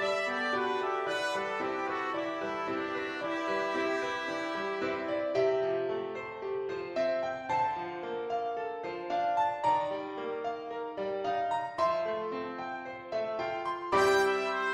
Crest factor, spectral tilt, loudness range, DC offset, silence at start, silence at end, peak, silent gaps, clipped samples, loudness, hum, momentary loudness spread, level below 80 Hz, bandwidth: 18 dB; -4 dB/octave; 2 LU; under 0.1%; 0 s; 0 s; -14 dBFS; none; under 0.1%; -32 LUFS; none; 8 LU; -70 dBFS; 14 kHz